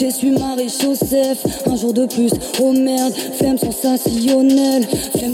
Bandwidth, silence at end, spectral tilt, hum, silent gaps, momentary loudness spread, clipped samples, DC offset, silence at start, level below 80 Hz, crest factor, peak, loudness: 17 kHz; 0 s; -4.5 dB/octave; none; none; 5 LU; under 0.1%; under 0.1%; 0 s; -44 dBFS; 12 dB; -4 dBFS; -16 LUFS